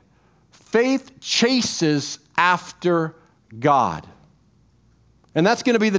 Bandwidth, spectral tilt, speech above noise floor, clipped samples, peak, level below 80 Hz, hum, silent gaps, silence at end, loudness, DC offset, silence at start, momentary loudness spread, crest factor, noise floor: 8 kHz; -4 dB/octave; 38 dB; under 0.1%; -2 dBFS; -58 dBFS; none; none; 0 s; -20 LUFS; under 0.1%; 0.75 s; 7 LU; 20 dB; -58 dBFS